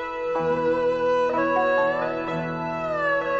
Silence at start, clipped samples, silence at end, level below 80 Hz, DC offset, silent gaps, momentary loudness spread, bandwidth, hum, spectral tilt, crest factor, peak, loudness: 0 s; under 0.1%; 0 s; -54 dBFS; under 0.1%; none; 7 LU; 7.8 kHz; none; -6.5 dB/octave; 12 dB; -12 dBFS; -24 LUFS